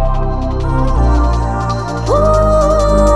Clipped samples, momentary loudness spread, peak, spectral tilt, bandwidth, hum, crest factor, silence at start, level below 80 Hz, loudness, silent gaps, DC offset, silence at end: under 0.1%; 7 LU; 0 dBFS; -7 dB/octave; 10.5 kHz; none; 12 dB; 0 s; -16 dBFS; -14 LUFS; none; 2%; 0 s